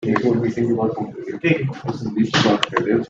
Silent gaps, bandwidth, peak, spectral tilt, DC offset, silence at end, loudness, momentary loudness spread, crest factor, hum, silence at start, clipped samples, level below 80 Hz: none; 7.8 kHz; -2 dBFS; -6 dB/octave; under 0.1%; 0 s; -20 LUFS; 9 LU; 18 dB; none; 0 s; under 0.1%; -56 dBFS